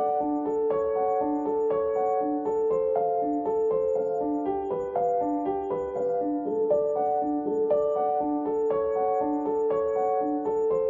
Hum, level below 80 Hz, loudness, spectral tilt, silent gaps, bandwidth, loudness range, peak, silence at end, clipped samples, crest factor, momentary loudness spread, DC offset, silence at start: none; -60 dBFS; -26 LUFS; -9 dB/octave; none; 7.2 kHz; 1 LU; -14 dBFS; 0 s; under 0.1%; 12 dB; 3 LU; under 0.1%; 0 s